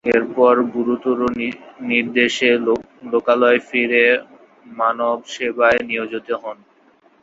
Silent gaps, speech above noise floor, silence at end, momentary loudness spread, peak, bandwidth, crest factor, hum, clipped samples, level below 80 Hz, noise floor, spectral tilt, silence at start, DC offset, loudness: none; 36 dB; 0.7 s; 10 LU; 0 dBFS; 7.8 kHz; 18 dB; none; under 0.1%; -58 dBFS; -54 dBFS; -4 dB/octave; 0.05 s; under 0.1%; -18 LUFS